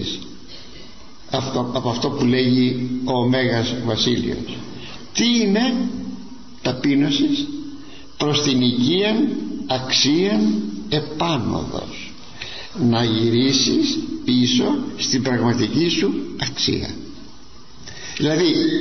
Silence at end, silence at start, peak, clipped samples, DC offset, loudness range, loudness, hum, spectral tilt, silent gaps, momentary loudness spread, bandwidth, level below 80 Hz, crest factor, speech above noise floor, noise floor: 0 s; 0 s; -4 dBFS; under 0.1%; 1%; 3 LU; -19 LUFS; none; -4.5 dB/octave; none; 18 LU; 6.4 kHz; -50 dBFS; 16 dB; 25 dB; -44 dBFS